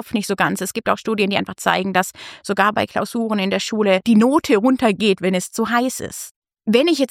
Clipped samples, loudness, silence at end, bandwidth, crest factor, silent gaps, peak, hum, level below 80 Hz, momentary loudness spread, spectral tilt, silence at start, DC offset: under 0.1%; -18 LUFS; 0.05 s; 16 kHz; 18 dB; 6.31-6.42 s; 0 dBFS; none; -58 dBFS; 10 LU; -4.5 dB/octave; 0 s; under 0.1%